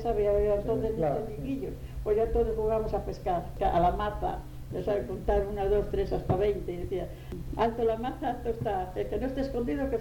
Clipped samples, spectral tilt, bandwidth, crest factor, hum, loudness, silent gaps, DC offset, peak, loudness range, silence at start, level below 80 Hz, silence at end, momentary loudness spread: under 0.1%; -8 dB/octave; 18 kHz; 16 dB; none; -30 LUFS; none; under 0.1%; -14 dBFS; 2 LU; 0 s; -40 dBFS; 0 s; 9 LU